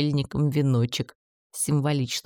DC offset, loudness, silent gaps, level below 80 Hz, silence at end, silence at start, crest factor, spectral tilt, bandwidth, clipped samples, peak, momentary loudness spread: under 0.1%; -25 LUFS; 1.15-1.50 s; -54 dBFS; 0.05 s; 0 s; 16 dB; -5.5 dB/octave; 19 kHz; under 0.1%; -10 dBFS; 10 LU